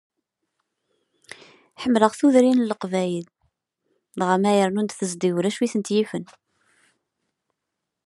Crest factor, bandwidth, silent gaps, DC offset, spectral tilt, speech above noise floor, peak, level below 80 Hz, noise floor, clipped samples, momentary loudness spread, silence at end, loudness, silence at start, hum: 22 dB; 12 kHz; none; under 0.1%; -5.5 dB/octave; 61 dB; -2 dBFS; -72 dBFS; -82 dBFS; under 0.1%; 12 LU; 1.8 s; -22 LUFS; 1.8 s; none